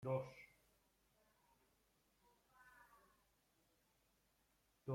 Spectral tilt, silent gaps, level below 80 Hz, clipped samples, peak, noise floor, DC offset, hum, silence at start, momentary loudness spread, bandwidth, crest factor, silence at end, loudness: -8 dB/octave; none; -84 dBFS; under 0.1%; -30 dBFS; -81 dBFS; under 0.1%; none; 0 s; 22 LU; 16 kHz; 24 dB; 0 s; -49 LUFS